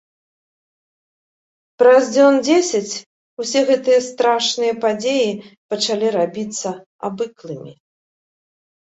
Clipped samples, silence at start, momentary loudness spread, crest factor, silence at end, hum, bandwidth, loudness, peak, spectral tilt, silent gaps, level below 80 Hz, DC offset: under 0.1%; 1.8 s; 16 LU; 18 dB; 1.15 s; none; 8.2 kHz; -17 LUFS; -2 dBFS; -3.5 dB/octave; 3.06-3.37 s, 5.57-5.69 s, 6.86-6.99 s; -68 dBFS; under 0.1%